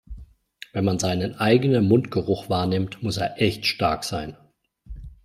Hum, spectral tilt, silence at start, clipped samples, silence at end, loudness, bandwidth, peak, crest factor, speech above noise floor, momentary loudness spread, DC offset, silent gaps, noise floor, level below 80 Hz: none; -5.5 dB/octave; 0.1 s; under 0.1%; 0.1 s; -23 LUFS; 15.5 kHz; -4 dBFS; 20 dB; 25 dB; 14 LU; under 0.1%; none; -47 dBFS; -46 dBFS